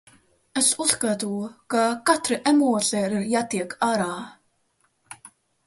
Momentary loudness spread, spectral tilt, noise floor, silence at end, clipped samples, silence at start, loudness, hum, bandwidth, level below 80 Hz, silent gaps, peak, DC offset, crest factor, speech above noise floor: 15 LU; -3 dB/octave; -68 dBFS; 0.4 s; under 0.1%; 0.55 s; -23 LUFS; none; 12 kHz; -66 dBFS; none; -4 dBFS; under 0.1%; 20 dB; 45 dB